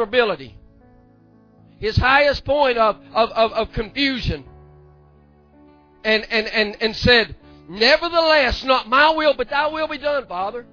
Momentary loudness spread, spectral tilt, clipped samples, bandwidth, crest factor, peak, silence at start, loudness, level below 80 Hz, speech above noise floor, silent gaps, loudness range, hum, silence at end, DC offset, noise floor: 12 LU; -5 dB/octave; under 0.1%; 5.4 kHz; 18 dB; -2 dBFS; 0 s; -18 LUFS; -38 dBFS; 33 dB; none; 6 LU; none; 0.1 s; under 0.1%; -52 dBFS